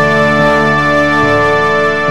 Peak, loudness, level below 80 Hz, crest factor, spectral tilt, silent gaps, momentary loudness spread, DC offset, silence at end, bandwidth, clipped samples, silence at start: -2 dBFS; -10 LUFS; -34 dBFS; 10 dB; -5.5 dB/octave; none; 1 LU; 3%; 0 s; 14 kHz; under 0.1%; 0 s